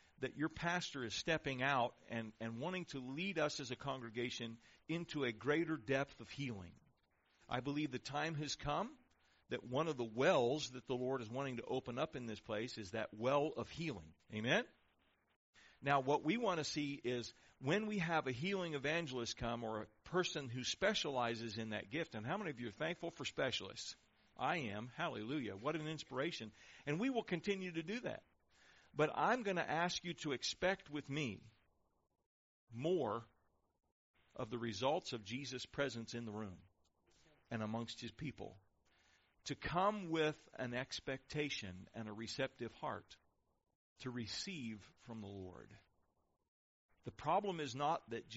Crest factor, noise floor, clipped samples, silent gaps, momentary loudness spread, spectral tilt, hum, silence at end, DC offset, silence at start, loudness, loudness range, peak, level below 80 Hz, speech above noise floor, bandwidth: 22 dB; -80 dBFS; under 0.1%; 15.36-15.53 s, 32.26-32.67 s, 33.92-34.14 s, 43.75-43.96 s, 46.48-46.89 s; 12 LU; -3.5 dB/octave; none; 0 s; under 0.1%; 0.2 s; -42 LUFS; 7 LU; -22 dBFS; -70 dBFS; 38 dB; 7.6 kHz